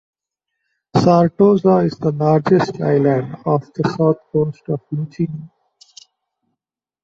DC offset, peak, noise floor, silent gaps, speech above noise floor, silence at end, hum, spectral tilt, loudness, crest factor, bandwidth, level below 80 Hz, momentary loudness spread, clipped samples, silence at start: under 0.1%; -2 dBFS; -83 dBFS; none; 67 dB; 1.55 s; none; -8.5 dB/octave; -17 LUFS; 16 dB; 7.8 kHz; -54 dBFS; 11 LU; under 0.1%; 0.95 s